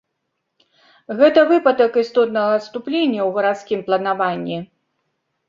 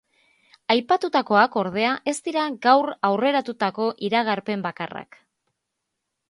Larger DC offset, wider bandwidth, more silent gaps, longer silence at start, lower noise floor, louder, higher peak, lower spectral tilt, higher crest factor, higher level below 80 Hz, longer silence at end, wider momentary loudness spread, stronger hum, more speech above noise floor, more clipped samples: neither; second, 7.4 kHz vs 11.5 kHz; neither; first, 1.1 s vs 0.7 s; second, -75 dBFS vs -80 dBFS; first, -17 LUFS vs -22 LUFS; about the same, -2 dBFS vs -2 dBFS; first, -6.5 dB/octave vs -4.5 dB/octave; about the same, 18 dB vs 22 dB; about the same, -68 dBFS vs -70 dBFS; second, 0.85 s vs 1.25 s; about the same, 11 LU vs 10 LU; neither; about the same, 58 dB vs 58 dB; neither